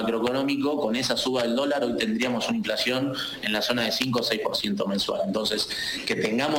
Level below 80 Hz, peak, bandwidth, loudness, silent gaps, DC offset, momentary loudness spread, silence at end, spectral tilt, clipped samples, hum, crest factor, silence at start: -58 dBFS; -10 dBFS; 17 kHz; -25 LUFS; none; under 0.1%; 3 LU; 0 s; -4 dB/octave; under 0.1%; none; 16 dB; 0 s